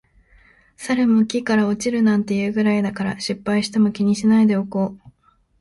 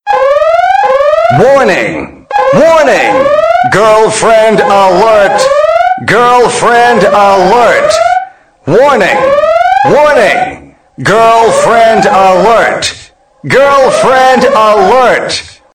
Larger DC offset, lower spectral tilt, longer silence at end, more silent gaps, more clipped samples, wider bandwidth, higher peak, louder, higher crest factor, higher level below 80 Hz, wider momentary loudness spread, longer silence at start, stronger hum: second, under 0.1% vs 0.5%; first, -6 dB/octave vs -4 dB/octave; first, 0.65 s vs 0.25 s; neither; neither; second, 11.5 kHz vs 16.5 kHz; second, -6 dBFS vs 0 dBFS; second, -19 LUFS vs -6 LUFS; first, 14 dB vs 6 dB; second, -56 dBFS vs -40 dBFS; about the same, 8 LU vs 6 LU; first, 0.8 s vs 0.05 s; neither